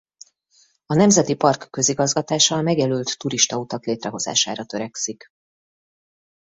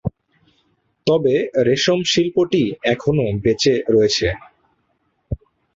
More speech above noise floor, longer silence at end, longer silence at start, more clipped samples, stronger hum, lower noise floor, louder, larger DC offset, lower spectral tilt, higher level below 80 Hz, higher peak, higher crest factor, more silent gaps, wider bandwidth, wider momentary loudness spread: second, 39 dB vs 50 dB; first, 1.4 s vs 0.4 s; first, 0.9 s vs 0.05 s; neither; neither; second, -60 dBFS vs -67 dBFS; second, -20 LUFS vs -17 LUFS; neither; second, -3.5 dB/octave vs -5 dB/octave; second, -60 dBFS vs -42 dBFS; about the same, -2 dBFS vs -2 dBFS; about the same, 20 dB vs 16 dB; neither; about the same, 8.2 kHz vs 7.8 kHz; second, 11 LU vs 16 LU